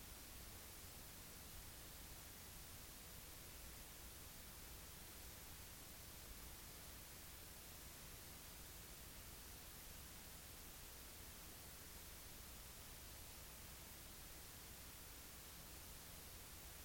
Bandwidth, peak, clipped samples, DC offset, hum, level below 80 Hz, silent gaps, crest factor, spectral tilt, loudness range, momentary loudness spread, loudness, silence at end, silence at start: 17 kHz; -42 dBFS; under 0.1%; under 0.1%; none; -64 dBFS; none; 14 dB; -2.5 dB/octave; 0 LU; 0 LU; -56 LUFS; 0 s; 0 s